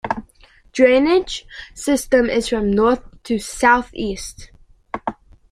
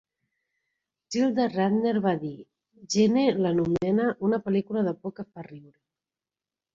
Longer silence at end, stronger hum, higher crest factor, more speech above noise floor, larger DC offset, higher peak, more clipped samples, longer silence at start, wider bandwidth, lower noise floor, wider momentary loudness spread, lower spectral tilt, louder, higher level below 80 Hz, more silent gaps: second, 0.4 s vs 1.15 s; neither; about the same, 18 dB vs 18 dB; second, 33 dB vs over 65 dB; neither; first, -2 dBFS vs -10 dBFS; neither; second, 0.05 s vs 1.1 s; first, 15 kHz vs 7.8 kHz; second, -50 dBFS vs under -90 dBFS; about the same, 15 LU vs 17 LU; second, -4 dB/octave vs -6 dB/octave; first, -18 LUFS vs -25 LUFS; first, -42 dBFS vs -64 dBFS; neither